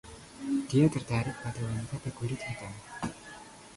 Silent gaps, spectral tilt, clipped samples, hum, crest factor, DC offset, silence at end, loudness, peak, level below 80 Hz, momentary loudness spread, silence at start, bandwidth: none; -6.5 dB/octave; under 0.1%; none; 20 dB; under 0.1%; 0 s; -32 LUFS; -14 dBFS; -56 dBFS; 19 LU; 0.05 s; 11.5 kHz